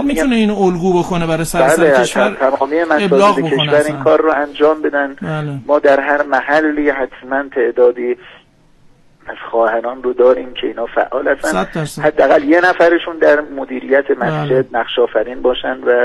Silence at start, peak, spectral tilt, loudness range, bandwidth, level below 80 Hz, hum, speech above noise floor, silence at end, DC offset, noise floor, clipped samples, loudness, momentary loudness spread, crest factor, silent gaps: 0 s; 0 dBFS; -5.5 dB/octave; 5 LU; 12.5 kHz; -42 dBFS; none; 34 dB; 0 s; under 0.1%; -47 dBFS; under 0.1%; -14 LUFS; 9 LU; 14 dB; none